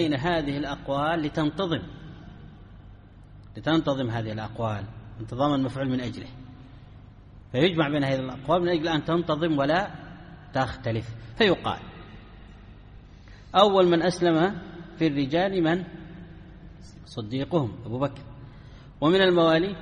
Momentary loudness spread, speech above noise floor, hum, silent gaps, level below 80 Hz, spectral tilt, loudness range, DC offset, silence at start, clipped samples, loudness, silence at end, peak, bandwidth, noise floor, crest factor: 24 LU; 23 dB; none; none; -50 dBFS; -6.5 dB/octave; 7 LU; under 0.1%; 0 s; under 0.1%; -25 LUFS; 0 s; -4 dBFS; 10 kHz; -48 dBFS; 22 dB